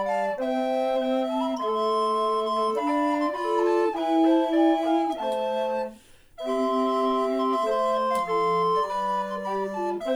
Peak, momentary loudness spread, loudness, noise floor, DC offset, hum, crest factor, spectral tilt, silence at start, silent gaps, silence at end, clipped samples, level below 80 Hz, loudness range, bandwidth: -10 dBFS; 7 LU; -25 LUFS; -49 dBFS; under 0.1%; none; 14 dB; -5.5 dB/octave; 0 s; none; 0 s; under 0.1%; -60 dBFS; 2 LU; over 20 kHz